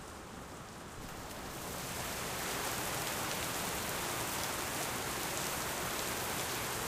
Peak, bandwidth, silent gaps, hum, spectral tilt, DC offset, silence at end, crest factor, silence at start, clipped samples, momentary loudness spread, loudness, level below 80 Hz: -16 dBFS; 16 kHz; none; none; -2 dB/octave; under 0.1%; 0 s; 22 dB; 0 s; under 0.1%; 11 LU; -37 LUFS; -56 dBFS